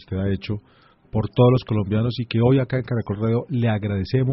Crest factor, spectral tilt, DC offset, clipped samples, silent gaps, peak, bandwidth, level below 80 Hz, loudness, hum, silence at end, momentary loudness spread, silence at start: 16 dB; -7.5 dB/octave; under 0.1%; under 0.1%; none; -4 dBFS; 5.8 kHz; -46 dBFS; -22 LUFS; none; 0 s; 10 LU; 0.1 s